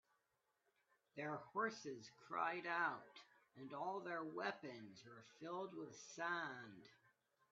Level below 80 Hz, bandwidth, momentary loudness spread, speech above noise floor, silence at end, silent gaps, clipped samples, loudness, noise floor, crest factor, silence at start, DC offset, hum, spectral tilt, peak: under -90 dBFS; 7.4 kHz; 18 LU; 39 dB; 0.55 s; none; under 0.1%; -47 LUFS; -87 dBFS; 22 dB; 1.15 s; under 0.1%; none; -2.5 dB/octave; -28 dBFS